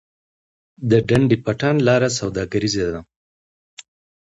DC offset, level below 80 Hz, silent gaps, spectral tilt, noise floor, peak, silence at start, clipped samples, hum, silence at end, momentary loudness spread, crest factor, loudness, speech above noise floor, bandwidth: under 0.1%; -46 dBFS; 3.16-3.77 s; -5.5 dB/octave; under -90 dBFS; -2 dBFS; 0.8 s; under 0.1%; none; 0.45 s; 9 LU; 18 dB; -19 LUFS; over 72 dB; 11 kHz